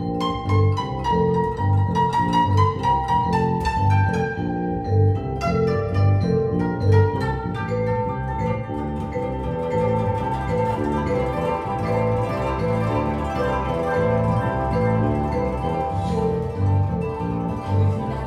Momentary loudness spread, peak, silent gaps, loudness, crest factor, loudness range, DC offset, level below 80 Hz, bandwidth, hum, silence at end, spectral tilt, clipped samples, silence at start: 6 LU; -6 dBFS; none; -22 LUFS; 16 dB; 3 LU; under 0.1%; -36 dBFS; 9.4 kHz; none; 0 s; -8 dB/octave; under 0.1%; 0 s